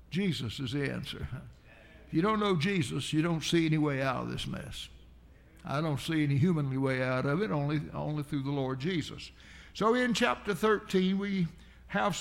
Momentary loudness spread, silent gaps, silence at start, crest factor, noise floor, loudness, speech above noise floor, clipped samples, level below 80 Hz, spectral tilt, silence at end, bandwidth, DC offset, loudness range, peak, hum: 13 LU; none; 0.1 s; 16 dB; -56 dBFS; -31 LUFS; 25 dB; under 0.1%; -54 dBFS; -6 dB/octave; 0 s; 16 kHz; under 0.1%; 2 LU; -14 dBFS; none